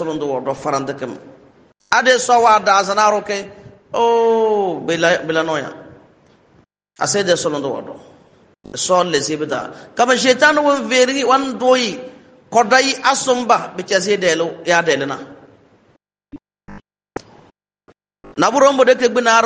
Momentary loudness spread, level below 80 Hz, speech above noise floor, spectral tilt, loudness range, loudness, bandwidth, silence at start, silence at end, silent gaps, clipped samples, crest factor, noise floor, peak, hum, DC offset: 16 LU; -60 dBFS; 43 dB; -3 dB/octave; 7 LU; -15 LUFS; 9.8 kHz; 0 s; 0 s; none; under 0.1%; 18 dB; -58 dBFS; 0 dBFS; none; under 0.1%